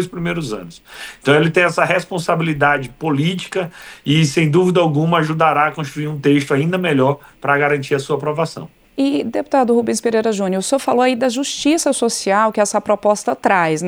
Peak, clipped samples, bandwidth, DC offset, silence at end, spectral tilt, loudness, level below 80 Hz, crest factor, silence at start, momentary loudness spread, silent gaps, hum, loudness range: -2 dBFS; under 0.1%; over 20 kHz; under 0.1%; 0 s; -5 dB/octave; -17 LUFS; -52 dBFS; 16 dB; 0 s; 9 LU; none; none; 2 LU